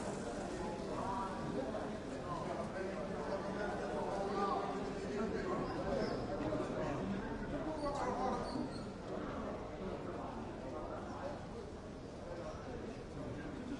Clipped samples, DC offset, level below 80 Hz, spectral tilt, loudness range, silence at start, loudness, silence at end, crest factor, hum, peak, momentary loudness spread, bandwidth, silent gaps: under 0.1%; under 0.1%; -56 dBFS; -6 dB/octave; 6 LU; 0 s; -42 LUFS; 0 s; 16 dB; none; -24 dBFS; 8 LU; 11.5 kHz; none